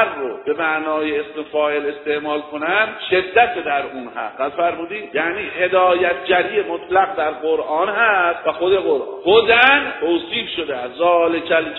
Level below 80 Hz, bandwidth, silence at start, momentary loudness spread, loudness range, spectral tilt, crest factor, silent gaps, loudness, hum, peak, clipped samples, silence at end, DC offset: -56 dBFS; 5.4 kHz; 0 s; 9 LU; 4 LU; -7 dB/octave; 18 dB; none; -18 LUFS; none; 0 dBFS; under 0.1%; 0 s; under 0.1%